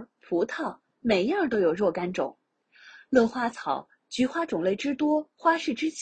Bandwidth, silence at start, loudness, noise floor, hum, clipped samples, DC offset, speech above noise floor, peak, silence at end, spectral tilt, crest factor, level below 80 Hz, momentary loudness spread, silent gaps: 9.2 kHz; 0 s; -27 LUFS; -56 dBFS; none; under 0.1%; under 0.1%; 30 dB; -8 dBFS; 0 s; -5 dB/octave; 20 dB; -64 dBFS; 9 LU; none